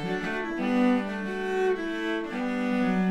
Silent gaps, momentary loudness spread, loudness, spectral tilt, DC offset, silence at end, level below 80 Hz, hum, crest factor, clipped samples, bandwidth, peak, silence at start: none; 6 LU; -28 LUFS; -6.5 dB/octave; under 0.1%; 0 s; -56 dBFS; none; 14 dB; under 0.1%; 10.5 kHz; -12 dBFS; 0 s